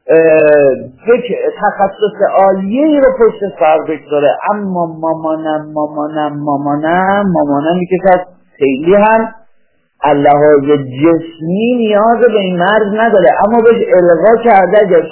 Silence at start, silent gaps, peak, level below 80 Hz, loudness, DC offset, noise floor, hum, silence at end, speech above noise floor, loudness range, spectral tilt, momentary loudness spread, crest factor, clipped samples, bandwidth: 0.05 s; none; 0 dBFS; -48 dBFS; -10 LUFS; under 0.1%; -54 dBFS; none; 0 s; 44 dB; 5 LU; -10.5 dB/octave; 9 LU; 10 dB; 0.1%; 4 kHz